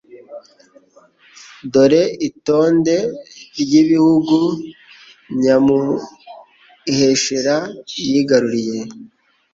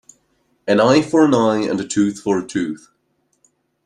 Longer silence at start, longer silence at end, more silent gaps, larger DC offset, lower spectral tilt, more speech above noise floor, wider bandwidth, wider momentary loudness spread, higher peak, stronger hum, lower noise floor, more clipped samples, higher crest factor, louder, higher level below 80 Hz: second, 0.15 s vs 0.65 s; second, 0.45 s vs 1.1 s; neither; neither; about the same, -5 dB/octave vs -5.5 dB/octave; second, 35 dB vs 50 dB; second, 7.8 kHz vs 10.5 kHz; first, 19 LU vs 12 LU; about the same, -2 dBFS vs -2 dBFS; neither; second, -51 dBFS vs -66 dBFS; neither; about the same, 16 dB vs 18 dB; about the same, -16 LUFS vs -17 LUFS; about the same, -58 dBFS vs -58 dBFS